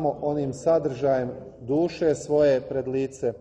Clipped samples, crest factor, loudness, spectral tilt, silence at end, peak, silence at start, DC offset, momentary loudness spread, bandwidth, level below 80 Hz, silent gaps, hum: under 0.1%; 14 dB; -25 LUFS; -7 dB/octave; 0 s; -10 dBFS; 0 s; under 0.1%; 7 LU; 10.5 kHz; -56 dBFS; none; none